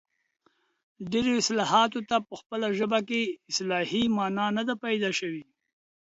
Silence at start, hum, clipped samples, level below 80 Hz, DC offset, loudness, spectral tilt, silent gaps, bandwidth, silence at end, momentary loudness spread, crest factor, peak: 1 s; none; under 0.1%; -66 dBFS; under 0.1%; -27 LUFS; -3.5 dB/octave; 2.46-2.50 s; 8 kHz; 0.6 s; 8 LU; 20 dB; -8 dBFS